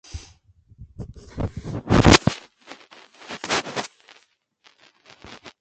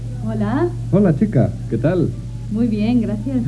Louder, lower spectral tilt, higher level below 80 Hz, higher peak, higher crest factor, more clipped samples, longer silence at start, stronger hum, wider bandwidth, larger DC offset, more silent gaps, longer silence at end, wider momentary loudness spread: second, -21 LUFS vs -18 LUFS; second, -4.5 dB/octave vs -9.5 dB/octave; about the same, -36 dBFS vs -34 dBFS; first, 0 dBFS vs -4 dBFS; first, 24 dB vs 14 dB; neither; first, 0.15 s vs 0 s; neither; second, 9.2 kHz vs 11 kHz; second, under 0.1% vs 0.1%; neither; about the same, 0.1 s vs 0 s; first, 29 LU vs 7 LU